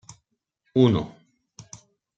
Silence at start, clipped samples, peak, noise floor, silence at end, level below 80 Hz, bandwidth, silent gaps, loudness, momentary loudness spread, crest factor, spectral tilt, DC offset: 0.75 s; under 0.1%; -4 dBFS; -74 dBFS; 1.1 s; -56 dBFS; 8 kHz; none; -22 LUFS; 25 LU; 22 dB; -7.5 dB/octave; under 0.1%